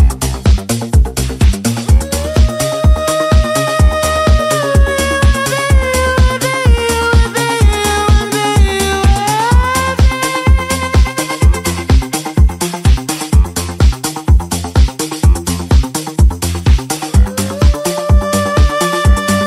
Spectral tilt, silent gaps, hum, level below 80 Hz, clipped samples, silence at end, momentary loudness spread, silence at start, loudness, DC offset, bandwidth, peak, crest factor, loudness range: -5 dB/octave; none; none; -14 dBFS; under 0.1%; 0 s; 3 LU; 0 s; -13 LUFS; under 0.1%; 15.5 kHz; 0 dBFS; 10 dB; 2 LU